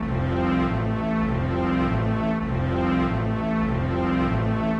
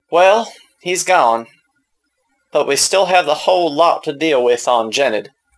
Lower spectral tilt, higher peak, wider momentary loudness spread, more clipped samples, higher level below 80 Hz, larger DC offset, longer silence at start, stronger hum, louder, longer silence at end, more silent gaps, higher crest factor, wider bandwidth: first, -9 dB/octave vs -2 dB/octave; second, -12 dBFS vs 0 dBFS; second, 2 LU vs 9 LU; neither; first, -34 dBFS vs -64 dBFS; neither; about the same, 0 s vs 0.1 s; neither; second, -24 LUFS vs -15 LUFS; second, 0 s vs 0.35 s; neither; about the same, 12 dB vs 16 dB; second, 8 kHz vs 11 kHz